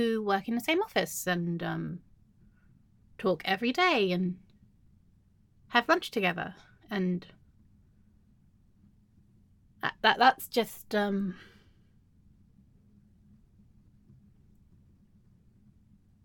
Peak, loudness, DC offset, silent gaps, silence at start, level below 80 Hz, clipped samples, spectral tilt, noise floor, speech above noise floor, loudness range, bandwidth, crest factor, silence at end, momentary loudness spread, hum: -6 dBFS; -29 LUFS; under 0.1%; none; 0 s; -66 dBFS; under 0.1%; -4.5 dB/octave; -64 dBFS; 35 dB; 8 LU; 17.5 kHz; 26 dB; 4.8 s; 13 LU; none